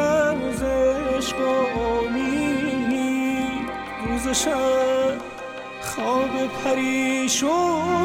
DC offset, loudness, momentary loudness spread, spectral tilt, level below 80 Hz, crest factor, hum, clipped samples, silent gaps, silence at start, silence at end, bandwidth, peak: under 0.1%; -22 LUFS; 9 LU; -3.5 dB/octave; -44 dBFS; 12 dB; none; under 0.1%; none; 0 s; 0 s; 16.5 kHz; -10 dBFS